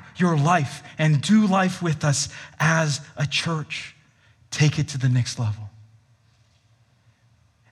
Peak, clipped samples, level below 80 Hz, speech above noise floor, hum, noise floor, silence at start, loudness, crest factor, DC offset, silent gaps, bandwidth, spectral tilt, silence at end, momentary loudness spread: -4 dBFS; under 0.1%; -62 dBFS; 39 dB; none; -60 dBFS; 0 s; -22 LUFS; 18 dB; under 0.1%; none; 12 kHz; -5 dB/octave; 2 s; 13 LU